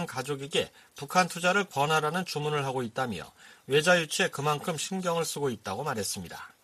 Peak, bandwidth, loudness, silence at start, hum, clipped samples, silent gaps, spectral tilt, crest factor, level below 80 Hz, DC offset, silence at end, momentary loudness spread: -10 dBFS; 15 kHz; -29 LUFS; 0 s; none; under 0.1%; none; -3.5 dB/octave; 20 dB; -68 dBFS; under 0.1%; 0.15 s; 10 LU